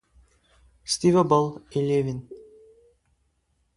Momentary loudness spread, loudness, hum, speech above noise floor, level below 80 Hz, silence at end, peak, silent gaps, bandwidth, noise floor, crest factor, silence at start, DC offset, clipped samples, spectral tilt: 19 LU; -23 LUFS; none; 48 dB; -58 dBFS; 1.35 s; -6 dBFS; none; 11.5 kHz; -70 dBFS; 20 dB; 0.85 s; under 0.1%; under 0.1%; -6 dB/octave